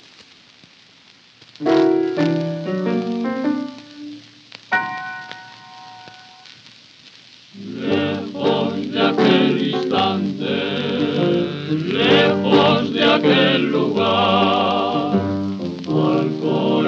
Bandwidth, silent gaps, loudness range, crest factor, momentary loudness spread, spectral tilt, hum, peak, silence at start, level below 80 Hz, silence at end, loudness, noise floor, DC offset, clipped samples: 7.6 kHz; none; 13 LU; 18 dB; 19 LU; -6.5 dB/octave; none; -2 dBFS; 0.2 s; -68 dBFS; 0 s; -18 LUFS; -49 dBFS; under 0.1%; under 0.1%